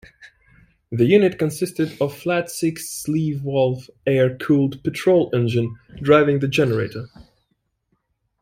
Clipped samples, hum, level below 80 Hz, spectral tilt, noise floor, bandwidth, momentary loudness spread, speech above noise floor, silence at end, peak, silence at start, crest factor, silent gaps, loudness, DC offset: under 0.1%; none; -54 dBFS; -6.5 dB/octave; -71 dBFS; 16.5 kHz; 11 LU; 52 dB; 1.2 s; -2 dBFS; 0.2 s; 18 dB; none; -20 LUFS; under 0.1%